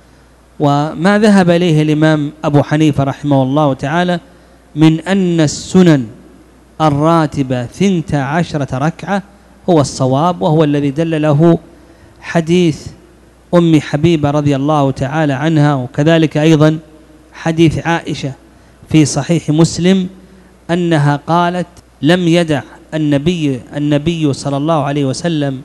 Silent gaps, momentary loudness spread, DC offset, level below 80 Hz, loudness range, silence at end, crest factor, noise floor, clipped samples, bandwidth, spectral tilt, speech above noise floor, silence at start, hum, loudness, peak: none; 8 LU; under 0.1%; -42 dBFS; 3 LU; 0 s; 12 dB; -44 dBFS; 0.5%; 11.5 kHz; -6.5 dB/octave; 32 dB; 0.6 s; none; -13 LUFS; 0 dBFS